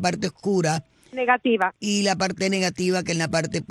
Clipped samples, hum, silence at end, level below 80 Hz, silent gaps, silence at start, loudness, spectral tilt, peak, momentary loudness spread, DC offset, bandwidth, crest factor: under 0.1%; none; 0.05 s; -60 dBFS; none; 0 s; -23 LUFS; -4.5 dB/octave; -6 dBFS; 6 LU; under 0.1%; 12.5 kHz; 18 dB